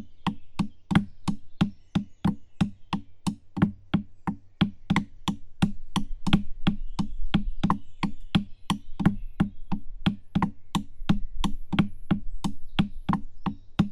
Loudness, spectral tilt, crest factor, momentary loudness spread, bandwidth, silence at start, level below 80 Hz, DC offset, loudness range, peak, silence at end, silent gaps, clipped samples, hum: -30 LUFS; -6.5 dB/octave; 22 dB; 8 LU; 11.5 kHz; 0 s; -36 dBFS; under 0.1%; 1 LU; -6 dBFS; 0 s; none; under 0.1%; none